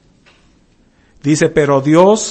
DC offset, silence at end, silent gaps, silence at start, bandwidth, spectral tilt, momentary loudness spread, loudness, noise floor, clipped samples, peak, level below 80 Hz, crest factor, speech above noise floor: under 0.1%; 0 s; none; 1.25 s; 8.8 kHz; -5.5 dB/octave; 7 LU; -12 LUFS; -52 dBFS; 0.2%; 0 dBFS; -46 dBFS; 14 dB; 41 dB